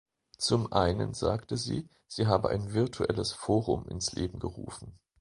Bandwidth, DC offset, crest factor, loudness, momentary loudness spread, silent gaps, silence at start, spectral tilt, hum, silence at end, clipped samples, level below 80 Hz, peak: 11 kHz; under 0.1%; 22 dB; -31 LUFS; 12 LU; none; 0.4 s; -5.5 dB/octave; none; 0.25 s; under 0.1%; -48 dBFS; -8 dBFS